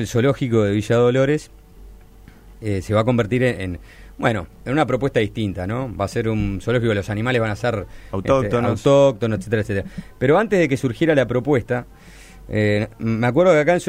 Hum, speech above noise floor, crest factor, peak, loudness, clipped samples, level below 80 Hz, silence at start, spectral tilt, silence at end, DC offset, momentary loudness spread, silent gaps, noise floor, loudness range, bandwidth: none; 25 dB; 18 dB; -2 dBFS; -20 LUFS; under 0.1%; -42 dBFS; 0 s; -7 dB/octave; 0 s; under 0.1%; 10 LU; none; -44 dBFS; 4 LU; 15.5 kHz